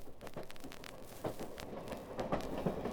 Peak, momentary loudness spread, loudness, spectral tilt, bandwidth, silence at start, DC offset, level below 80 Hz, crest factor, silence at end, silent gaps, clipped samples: -20 dBFS; 11 LU; -44 LUFS; -6 dB/octave; over 20 kHz; 0 s; under 0.1%; -56 dBFS; 22 dB; 0 s; none; under 0.1%